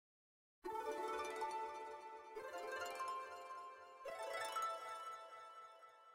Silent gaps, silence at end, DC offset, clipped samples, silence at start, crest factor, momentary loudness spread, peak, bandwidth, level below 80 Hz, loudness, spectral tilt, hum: none; 0 s; under 0.1%; under 0.1%; 0.65 s; 16 dB; 12 LU; -32 dBFS; 16 kHz; -84 dBFS; -48 LUFS; -1.5 dB/octave; none